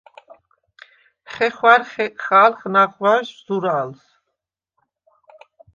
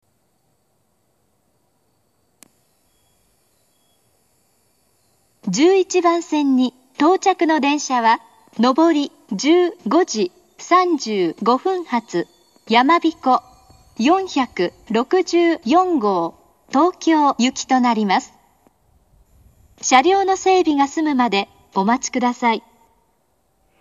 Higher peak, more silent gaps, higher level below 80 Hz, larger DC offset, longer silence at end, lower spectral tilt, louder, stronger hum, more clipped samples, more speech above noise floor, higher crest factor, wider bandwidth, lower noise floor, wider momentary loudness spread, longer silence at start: about the same, 0 dBFS vs 0 dBFS; neither; second, -70 dBFS vs -62 dBFS; neither; first, 1.8 s vs 1.2 s; first, -5.5 dB/octave vs -4 dB/octave; about the same, -17 LUFS vs -18 LUFS; neither; neither; first, 62 dB vs 49 dB; about the same, 20 dB vs 18 dB; second, 7.4 kHz vs 8.2 kHz; first, -80 dBFS vs -66 dBFS; first, 12 LU vs 8 LU; second, 1.3 s vs 5.45 s